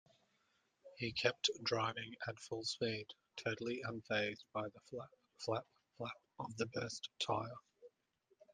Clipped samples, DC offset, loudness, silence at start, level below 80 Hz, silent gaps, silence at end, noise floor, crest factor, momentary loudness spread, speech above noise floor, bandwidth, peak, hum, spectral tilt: under 0.1%; under 0.1%; -42 LUFS; 0.85 s; -78 dBFS; none; 0.65 s; -80 dBFS; 26 dB; 13 LU; 38 dB; 10 kHz; -18 dBFS; none; -3.5 dB/octave